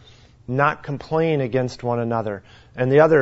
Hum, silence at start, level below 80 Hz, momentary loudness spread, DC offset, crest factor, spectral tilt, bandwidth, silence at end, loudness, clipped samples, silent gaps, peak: none; 0.5 s; -54 dBFS; 13 LU; under 0.1%; 18 dB; -8 dB/octave; 8 kHz; 0 s; -21 LUFS; under 0.1%; none; -2 dBFS